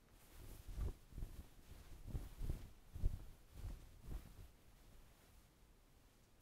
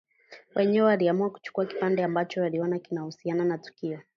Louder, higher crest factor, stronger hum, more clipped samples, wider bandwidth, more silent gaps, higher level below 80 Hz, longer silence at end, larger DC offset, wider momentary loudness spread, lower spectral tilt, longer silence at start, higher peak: second, -54 LUFS vs -27 LUFS; first, 24 dB vs 16 dB; neither; neither; first, 16 kHz vs 7 kHz; neither; first, -52 dBFS vs -76 dBFS; second, 0 s vs 0.15 s; neither; first, 19 LU vs 12 LU; second, -6 dB/octave vs -8 dB/octave; second, 0 s vs 0.3 s; second, -28 dBFS vs -10 dBFS